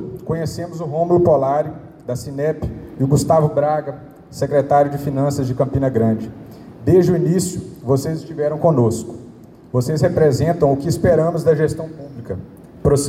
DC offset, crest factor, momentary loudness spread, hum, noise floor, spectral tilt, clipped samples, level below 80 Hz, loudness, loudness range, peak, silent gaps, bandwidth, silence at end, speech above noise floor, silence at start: under 0.1%; 14 dB; 15 LU; none; -40 dBFS; -7 dB/octave; under 0.1%; -42 dBFS; -18 LUFS; 2 LU; -4 dBFS; none; 15.5 kHz; 0 s; 23 dB; 0 s